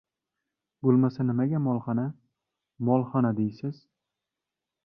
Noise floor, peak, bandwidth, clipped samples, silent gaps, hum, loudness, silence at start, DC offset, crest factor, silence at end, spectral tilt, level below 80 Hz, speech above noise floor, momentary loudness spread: -88 dBFS; -10 dBFS; 5.6 kHz; under 0.1%; none; none; -27 LUFS; 0.85 s; under 0.1%; 18 dB; 1.1 s; -11.5 dB/octave; -68 dBFS; 62 dB; 10 LU